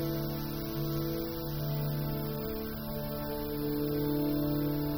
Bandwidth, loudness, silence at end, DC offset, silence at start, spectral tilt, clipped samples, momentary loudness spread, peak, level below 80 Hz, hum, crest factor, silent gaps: over 20 kHz; -34 LUFS; 0 s; under 0.1%; 0 s; -7 dB/octave; under 0.1%; 6 LU; -20 dBFS; -46 dBFS; none; 12 dB; none